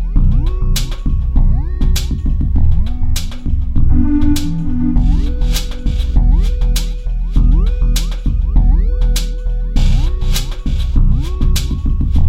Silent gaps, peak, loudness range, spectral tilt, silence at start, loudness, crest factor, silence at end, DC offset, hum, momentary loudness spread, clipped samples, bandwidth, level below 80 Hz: none; 0 dBFS; 1 LU; -6 dB/octave; 0 s; -17 LUFS; 12 dB; 0 s; under 0.1%; none; 5 LU; under 0.1%; 15.5 kHz; -12 dBFS